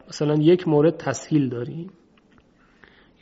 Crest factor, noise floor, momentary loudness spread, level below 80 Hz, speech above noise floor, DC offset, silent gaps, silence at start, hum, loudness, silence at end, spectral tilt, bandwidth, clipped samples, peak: 18 dB; -57 dBFS; 16 LU; -62 dBFS; 36 dB; under 0.1%; none; 0.1 s; none; -21 LUFS; 1.35 s; -7 dB/octave; 8 kHz; under 0.1%; -6 dBFS